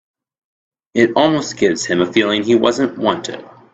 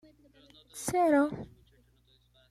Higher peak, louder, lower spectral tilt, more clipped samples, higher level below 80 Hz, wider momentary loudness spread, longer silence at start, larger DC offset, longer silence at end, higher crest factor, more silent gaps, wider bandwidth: first, 0 dBFS vs -16 dBFS; first, -16 LUFS vs -28 LUFS; about the same, -4.5 dB/octave vs -5 dB/octave; neither; first, -56 dBFS vs -64 dBFS; second, 10 LU vs 22 LU; first, 0.95 s vs 0.75 s; neither; second, 0.3 s vs 1.05 s; about the same, 16 dB vs 18 dB; neither; second, 8.2 kHz vs 15 kHz